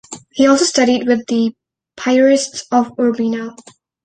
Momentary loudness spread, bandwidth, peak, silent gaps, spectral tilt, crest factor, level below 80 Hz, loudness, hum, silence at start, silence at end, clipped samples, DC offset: 11 LU; 9.6 kHz; -2 dBFS; none; -3.5 dB/octave; 14 dB; -58 dBFS; -15 LUFS; none; 0.1 s; 0.5 s; under 0.1%; under 0.1%